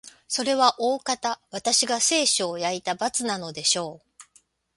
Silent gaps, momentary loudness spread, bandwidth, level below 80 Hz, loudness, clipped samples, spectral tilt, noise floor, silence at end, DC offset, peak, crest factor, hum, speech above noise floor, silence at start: none; 9 LU; 12 kHz; -68 dBFS; -23 LUFS; under 0.1%; -1 dB/octave; -62 dBFS; 0.55 s; under 0.1%; -2 dBFS; 24 dB; none; 37 dB; 0.05 s